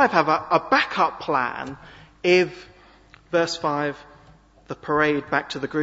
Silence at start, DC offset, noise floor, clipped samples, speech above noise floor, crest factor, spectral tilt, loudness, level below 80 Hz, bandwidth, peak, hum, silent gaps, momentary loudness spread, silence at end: 0 s; under 0.1%; -52 dBFS; under 0.1%; 30 dB; 22 dB; -5 dB/octave; -22 LUFS; -58 dBFS; 8 kHz; -2 dBFS; none; none; 17 LU; 0 s